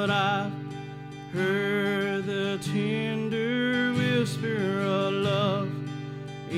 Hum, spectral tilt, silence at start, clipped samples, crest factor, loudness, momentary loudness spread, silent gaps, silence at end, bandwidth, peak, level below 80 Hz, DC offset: none; -6 dB/octave; 0 s; under 0.1%; 14 dB; -27 LUFS; 12 LU; none; 0 s; 15 kHz; -14 dBFS; -62 dBFS; under 0.1%